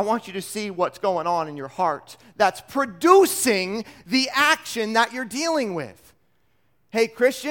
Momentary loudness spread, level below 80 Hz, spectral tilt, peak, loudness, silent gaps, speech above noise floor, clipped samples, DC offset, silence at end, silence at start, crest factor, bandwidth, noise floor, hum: 13 LU; -66 dBFS; -3 dB/octave; -2 dBFS; -22 LUFS; none; 46 dB; under 0.1%; under 0.1%; 0 s; 0 s; 20 dB; 18 kHz; -68 dBFS; none